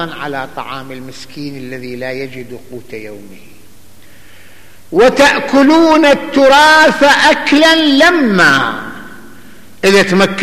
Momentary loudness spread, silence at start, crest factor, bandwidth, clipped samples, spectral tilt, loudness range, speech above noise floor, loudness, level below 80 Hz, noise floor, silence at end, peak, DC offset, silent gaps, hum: 22 LU; 0 s; 12 dB; 15 kHz; under 0.1%; -4 dB/octave; 19 LU; 32 dB; -8 LUFS; -44 dBFS; -42 dBFS; 0 s; 0 dBFS; 2%; none; none